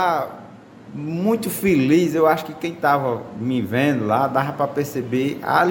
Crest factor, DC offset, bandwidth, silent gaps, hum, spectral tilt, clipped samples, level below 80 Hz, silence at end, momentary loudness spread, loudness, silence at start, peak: 18 dB; under 0.1%; 17 kHz; none; none; -6 dB/octave; under 0.1%; -58 dBFS; 0 s; 11 LU; -20 LUFS; 0 s; -4 dBFS